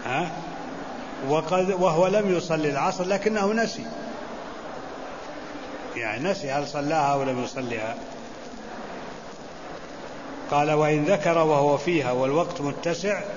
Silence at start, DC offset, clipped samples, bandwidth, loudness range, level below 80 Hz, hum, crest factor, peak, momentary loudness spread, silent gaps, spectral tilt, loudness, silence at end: 0 s; 0.5%; under 0.1%; 7.4 kHz; 7 LU; -56 dBFS; none; 18 dB; -8 dBFS; 17 LU; none; -5.5 dB/octave; -25 LUFS; 0 s